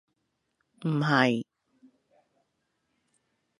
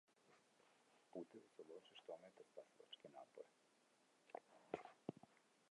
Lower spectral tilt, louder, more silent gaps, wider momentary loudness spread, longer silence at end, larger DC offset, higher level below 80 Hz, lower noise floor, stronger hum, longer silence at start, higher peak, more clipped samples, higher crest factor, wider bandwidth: about the same, -6.5 dB/octave vs -5.5 dB/octave; first, -26 LUFS vs -60 LUFS; neither; first, 14 LU vs 9 LU; first, 2.15 s vs 0.05 s; neither; first, -78 dBFS vs under -90 dBFS; about the same, -78 dBFS vs -79 dBFS; neither; first, 0.8 s vs 0.1 s; first, -6 dBFS vs -30 dBFS; neither; second, 26 dB vs 32 dB; about the same, 11 kHz vs 11 kHz